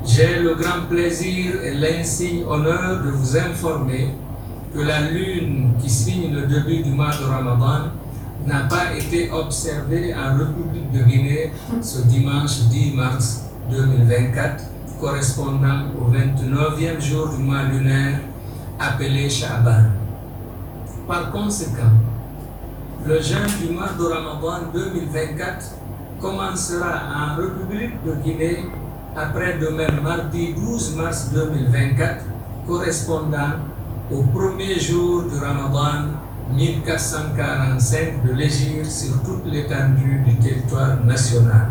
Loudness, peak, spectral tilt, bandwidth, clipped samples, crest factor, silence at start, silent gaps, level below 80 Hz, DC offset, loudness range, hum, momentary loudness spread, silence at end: -20 LUFS; -2 dBFS; -6 dB/octave; over 20 kHz; under 0.1%; 18 dB; 0 s; none; -36 dBFS; under 0.1%; 5 LU; none; 11 LU; 0 s